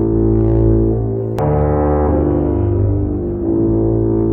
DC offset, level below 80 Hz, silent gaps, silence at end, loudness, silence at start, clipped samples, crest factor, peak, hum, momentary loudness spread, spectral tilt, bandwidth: under 0.1%; -22 dBFS; none; 0 s; -15 LUFS; 0 s; under 0.1%; 10 dB; -4 dBFS; none; 5 LU; -12 dB/octave; 3 kHz